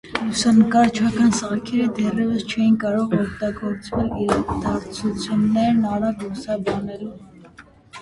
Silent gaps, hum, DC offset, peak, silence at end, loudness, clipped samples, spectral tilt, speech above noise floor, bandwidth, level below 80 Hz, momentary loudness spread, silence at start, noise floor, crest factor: none; none; under 0.1%; -2 dBFS; 0 s; -20 LUFS; under 0.1%; -5.5 dB/octave; 27 dB; 11.5 kHz; -44 dBFS; 10 LU; 0.05 s; -47 dBFS; 18 dB